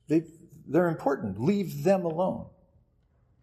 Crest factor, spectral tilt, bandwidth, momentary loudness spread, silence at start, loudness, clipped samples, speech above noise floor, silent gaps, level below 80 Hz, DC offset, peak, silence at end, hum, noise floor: 18 dB; -8 dB/octave; 14 kHz; 11 LU; 0.1 s; -28 LUFS; under 0.1%; 39 dB; none; -64 dBFS; under 0.1%; -12 dBFS; 0.95 s; none; -66 dBFS